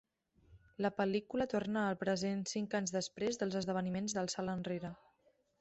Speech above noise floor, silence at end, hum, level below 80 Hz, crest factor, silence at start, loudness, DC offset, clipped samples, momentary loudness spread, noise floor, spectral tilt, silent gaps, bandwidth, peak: 37 dB; 0.65 s; none; -70 dBFS; 18 dB; 0.5 s; -38 LUFS; under 0.1%; under 0.1%; 4 LU; -74 dBFS; -5 dB/octave; none; 8.2 kHz; -22 dBFS